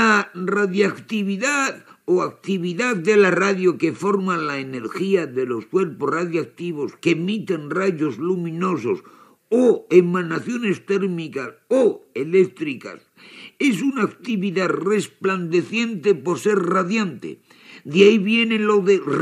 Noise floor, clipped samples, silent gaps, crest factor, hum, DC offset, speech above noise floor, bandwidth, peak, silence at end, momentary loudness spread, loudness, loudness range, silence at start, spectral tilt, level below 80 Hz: -44 dBFS; under 0.1%; none; 20 dB; none; under 0.1%; 24 dB; 13 kHz; 0 dBFS; 0 s; 11 LU; -20 LUFS; 4 LU; 0 s; -5.5 dB/octave; -80 dBFS